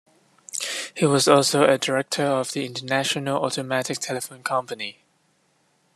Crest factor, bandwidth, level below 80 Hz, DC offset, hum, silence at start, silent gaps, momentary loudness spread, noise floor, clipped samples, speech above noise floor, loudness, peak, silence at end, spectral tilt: 22 dB; 13 kHz; -70 dBFS; under 0.1%; none; 0.55 s; none; 12 LU; -65 dBFS; under 0.1%; 43 dB; -23 LUFS; -2 dBFS; 1.05 s; -3.5 dB/octave